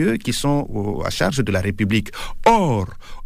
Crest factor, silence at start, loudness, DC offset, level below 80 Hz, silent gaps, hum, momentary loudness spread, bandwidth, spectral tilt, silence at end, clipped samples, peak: 16 dB; 0 s; -20 LUFS; under 0.1%; -34 dBFS; none; none; 8 LU; 15.5 kHz; -5.5 dB/octave; 0 s; under 0.1%; -4 dBFS